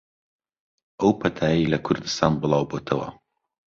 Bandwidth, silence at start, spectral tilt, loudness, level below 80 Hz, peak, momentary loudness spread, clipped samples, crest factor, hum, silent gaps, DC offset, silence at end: 7.6 kHz; 1 s; -6 dB/octave; -23 LUFS; -50 dBFS; -2 dBFS; 6 LU; under 0.1%; 22 dB; none; none; under 0.1%; 0.65 s